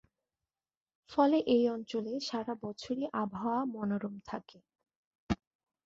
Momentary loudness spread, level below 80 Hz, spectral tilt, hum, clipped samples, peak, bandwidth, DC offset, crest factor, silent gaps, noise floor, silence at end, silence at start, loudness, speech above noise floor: 13 LU; -60 dBFS; -6.5 dB/octave; none; under 0.1%; -14 dBFS; 7.8 kHz; under 0.1%; 20 dB; 4.96-5.27 s; under -90 dBFS; 0.5 s; 1.1 s; -34 LUFS; over 57 dB